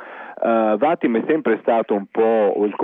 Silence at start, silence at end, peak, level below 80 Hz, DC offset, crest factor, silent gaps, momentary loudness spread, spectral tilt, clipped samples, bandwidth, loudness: 0 s; 0 s; -4 dBFS; -72 dBFS; under 0.1%; 14 dB; none; 5 LU; -9.5 dB/octave; under 0.1%; 3.9 kHz; -19 LUFS